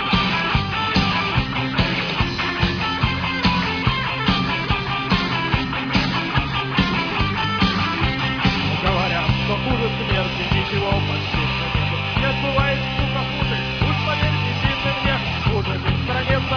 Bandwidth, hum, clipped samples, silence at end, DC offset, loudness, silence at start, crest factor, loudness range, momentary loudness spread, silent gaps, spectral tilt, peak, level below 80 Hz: 5.4 kHz; none; under 0.1%; 0 s; under 0.1%; -20 LUFS; 0 s; 18 dB; 1 LU; 2 LU; none; -6 dB/octave; -4 dBFS; -32 dBFS